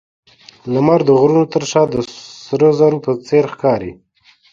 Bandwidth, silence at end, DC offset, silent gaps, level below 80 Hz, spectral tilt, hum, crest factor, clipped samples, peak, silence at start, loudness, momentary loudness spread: 7.6 kHz; 0.6 s; under 0.1%; none; -52 dBFS; -6.5 dB/octave; none; 16 dB; under 0.1%; 0 dBFS; 0.65 s; -14 LUFS; 14 LU